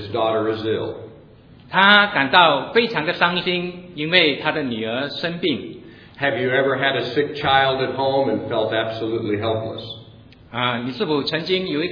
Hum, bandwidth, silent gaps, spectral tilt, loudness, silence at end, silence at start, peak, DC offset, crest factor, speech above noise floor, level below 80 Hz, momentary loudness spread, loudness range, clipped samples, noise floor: none; 5.4 kHz; none; -6.5 dB/octave; -19 LUFS; 0 s; 0 s; 0 dBFS; under 0.1%; 20 dB; 26 dB; -56 dBFS; 13 LU; 7 LU; under 0.1%; -46 dBFS